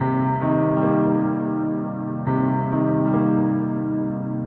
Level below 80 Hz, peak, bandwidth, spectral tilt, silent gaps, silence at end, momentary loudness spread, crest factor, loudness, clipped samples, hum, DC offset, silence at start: -54 dBFS; -8 dBFS; 3.4 kHz; -12.5 dB/octave; none; 0 s; 6 LU; 12 dB; -21 LUFS; under 0.1%; none; under 0.1%; 0 s